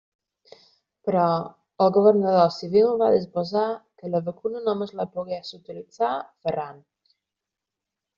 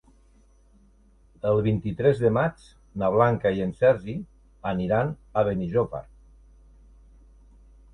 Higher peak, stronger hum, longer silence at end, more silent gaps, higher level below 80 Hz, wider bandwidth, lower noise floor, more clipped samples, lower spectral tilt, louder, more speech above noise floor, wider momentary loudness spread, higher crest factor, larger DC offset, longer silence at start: about the same, -4 dBFS vs -6 dBFS; neither; second, 1.4 s vs 1.9 s; neither; second, -68 dBFS vs -50 dBFS; second, 7.2 kHz vs 10 kHz; first, -86 dBFS vs -57 dBFS; neither; second, -6 dB/octave vs -9 dB/octave; about the same, -23 LUFS vs -25 LUFS; first, 64 dB vs 34 dB; about the same, 16 LU vs 14 LU; about the same, 20 dB vs 20 dB; neither; second, 1.05 s vs 1.45 s